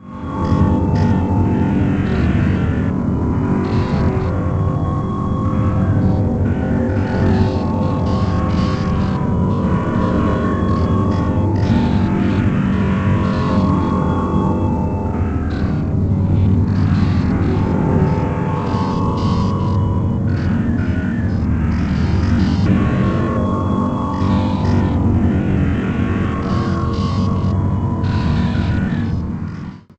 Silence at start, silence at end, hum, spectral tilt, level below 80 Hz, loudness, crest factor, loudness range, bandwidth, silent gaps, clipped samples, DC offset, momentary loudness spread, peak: 0 s; 0.2 s; none; -9 dB/octave; -26 dBFS; -17 LUFS; 14 dB; 2 LU; 7.8 kHz; none; under 0.1%; under 0.1%; 4 LU; -2 dBFS